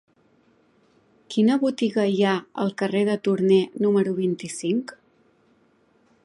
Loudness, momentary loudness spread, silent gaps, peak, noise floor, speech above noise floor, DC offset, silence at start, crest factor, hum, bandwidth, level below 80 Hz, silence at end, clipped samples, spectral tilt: -23 LUFS; 8 LU; none; -8 dBFS; -62 dBFS; 40 dB; under 0.1%; 1.3 s; 16 dB; none; 11.5 kHz; -72 dBFS; 1.35 s; under 0.1%; -6 dB/octave